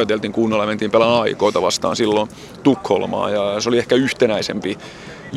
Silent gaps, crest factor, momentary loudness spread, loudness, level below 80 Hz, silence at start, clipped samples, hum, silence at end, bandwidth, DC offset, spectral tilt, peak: none; 18 dB; 9 LU; -18 LUFS; -54 dBFS; 0 s; under 0.1%; none; 0 s; 13 kHz; under 0.1%; -4.5 dB/octave; 0 dBFS